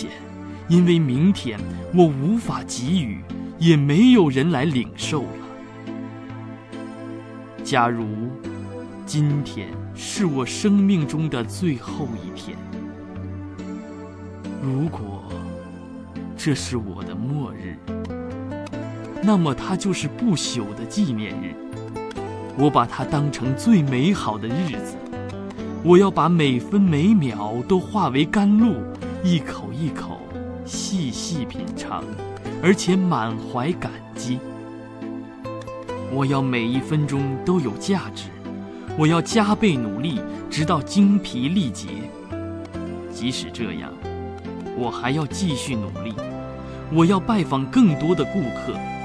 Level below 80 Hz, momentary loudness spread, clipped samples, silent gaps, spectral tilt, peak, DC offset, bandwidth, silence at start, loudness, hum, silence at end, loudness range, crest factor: -50 dBFS; 16 LU; under 0.1%; none; -6 dB/octave; -2 dBFS; under 0.1%; 11 kHz; 0 s; -22 LUFS; none; 0 s; 9 LU; 20 dB